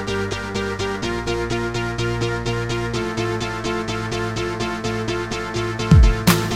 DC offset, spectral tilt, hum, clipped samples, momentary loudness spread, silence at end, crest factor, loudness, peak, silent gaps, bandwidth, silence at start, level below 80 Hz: 0.2%; -5.5 dB/octave; none; under 0.1%; 8 LU; 0 s; 20 dB; -22 LUFS; -2 dBFS; none; 16 kHz; 0 s; -26 dBFS